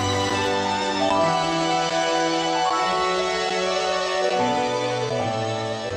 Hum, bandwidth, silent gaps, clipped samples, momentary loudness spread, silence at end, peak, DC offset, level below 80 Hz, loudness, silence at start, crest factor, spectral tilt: none; 12 kHz; none; under 0.1%; 4 LU; 0 s; -10 dBFS; under 0.1%; -54 dBFS; -22 LUFS; 0 s; 14 dB; -3.5 dB/octave